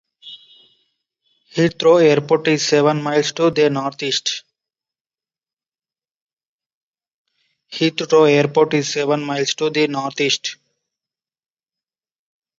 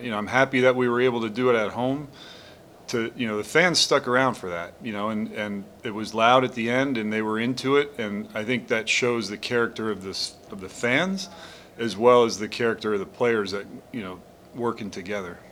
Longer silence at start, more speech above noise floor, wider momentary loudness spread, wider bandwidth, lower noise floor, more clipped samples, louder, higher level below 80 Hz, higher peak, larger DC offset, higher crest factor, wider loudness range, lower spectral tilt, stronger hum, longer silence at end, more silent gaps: first, 0.25 s vs 0 s; first, over 74 dB vs 23 dB; second, 13 LU vs 16 LU; second, 7.8 kHz vs 16.5 kHz; first, under -90 dBFS vs -48 dBFS; neither; first, -17 LUFS vs -24 LUFS; about the same, -64 dBFS vs -64 dBFS; about the same, -2 dBFS vs -4 dBFS; neither; about the same, 18 dB vs 22 dB; first, 10 LU vs 2 LU; about the same, -4.5 dB/octave vs -4 dB/octave; neither; first, 2.05 s vs 0 s; first, 5.01-5.05 s, 5.53-5.57 s, 6.16-6.27 s, 6.33-6.37 s, 6.47-6.59 s, 6.66-6.92 s, 7.14-7.25 s vs none